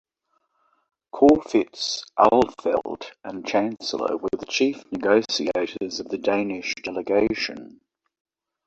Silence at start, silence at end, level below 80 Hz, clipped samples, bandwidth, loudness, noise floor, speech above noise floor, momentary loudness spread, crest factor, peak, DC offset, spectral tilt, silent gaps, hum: 1.15 s; 1 s; -58 dBFS; under 0.1%; 8.2 kHz; -23 LUFS; -72 dBFS; 49 dB; 12 LU; 22 dB; -2 dBFS; under 0.1%; -4 dB/octave; none; none